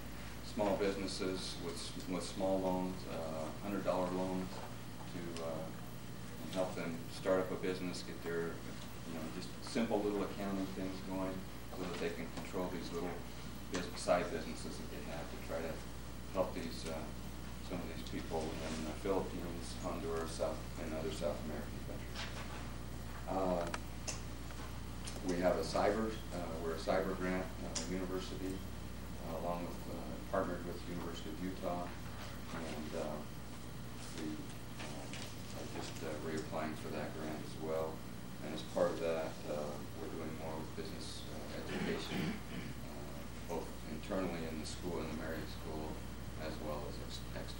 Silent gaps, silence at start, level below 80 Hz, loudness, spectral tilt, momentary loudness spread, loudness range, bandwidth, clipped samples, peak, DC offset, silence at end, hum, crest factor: none; 0 s; -54 dBFS; -42 LUFS; -5 dB/octave; 11 LU; 5 LU; 17 kHz; under 0.1%; -20 dBFS; 0.3%; 0 s; none; 20 dB